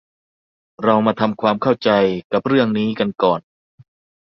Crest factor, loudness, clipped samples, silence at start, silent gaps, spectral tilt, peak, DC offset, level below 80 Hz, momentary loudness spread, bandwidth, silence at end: 18 dB; -18 LUFS; under 0.1%; 0.8 s; 2.24-2.30 s; -8 dB/octave; -2 dBFS; under 0.1%; -58 dBFS; 5 LU; 6.2 kHz; 0.85 s